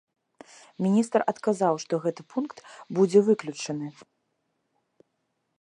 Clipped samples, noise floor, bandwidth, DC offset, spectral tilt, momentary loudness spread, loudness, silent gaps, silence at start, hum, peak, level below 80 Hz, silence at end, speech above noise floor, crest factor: under 0.1%; -77 dBFS; 11 kHz; under 0.1%; -6.5 dB/octave; 13 LU; -26 LUFS; none; 0.8 s; none; -8 dBFS; -80 dBFS; 1.7 s; 52 dB; 20 dB